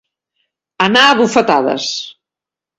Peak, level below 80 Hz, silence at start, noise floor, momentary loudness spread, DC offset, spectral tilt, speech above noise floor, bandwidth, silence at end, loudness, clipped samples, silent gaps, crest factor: 0 dBFS; -58 dBFS; 0.8 s; -87 dBFS; 13 LU; under 0.1%; -3 dB/octave; 75 dB; 12.5 kHz; 0.7 s; -12 LUFS; under 0.1%; none; 16 dB